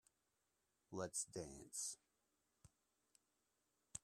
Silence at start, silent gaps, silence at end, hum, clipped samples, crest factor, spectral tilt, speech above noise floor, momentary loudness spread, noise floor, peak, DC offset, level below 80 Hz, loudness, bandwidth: 0.9 s; none; 0.05 s; none; under 0.1%; 24 dB; -3 dB/octave; 38 dB; 10 LU; -88 dBFS; -32 dBFS; under 0.1%; -80 dBFS; -49 LUFS; 14.5 kHz